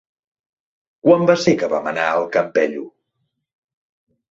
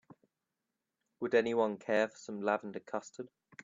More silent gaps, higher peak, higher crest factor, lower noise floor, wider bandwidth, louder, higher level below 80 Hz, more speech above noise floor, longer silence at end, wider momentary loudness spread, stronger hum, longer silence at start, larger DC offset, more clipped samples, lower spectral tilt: neither; first, -2 dBFS vs -16 dBFS; about the same, 18 dB vs 20 dB; second, -73 dBFS vs -88 dBFS; about the same, 7.8 kHz vs 7.6 kHz; first, -17 LUFS vs -34 LUFS; first, -62 dBFS vs -82 dBFS; about the same, 57 dB vs 54 dB; first, 1.4 s vs 0.4 s; second, 7 LU vs 16 LU; neither; second, 1.05 s vs 1.2 s; neither; neither; about the same, -5.5 dB/octave vs -5 dB/octave